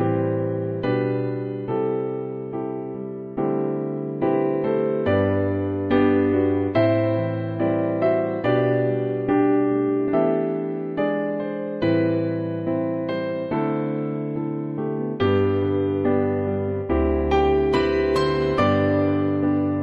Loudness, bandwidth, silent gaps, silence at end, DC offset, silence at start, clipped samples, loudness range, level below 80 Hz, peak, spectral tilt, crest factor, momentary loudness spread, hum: -22 LUFS; 8.2 kHz; none; 0 s; under 0.1%; 0 s; under 0.1%; 5 LU; -42 dBFS; -8 dBFS; -9 dB/octave; 14 dB; 8 LU; none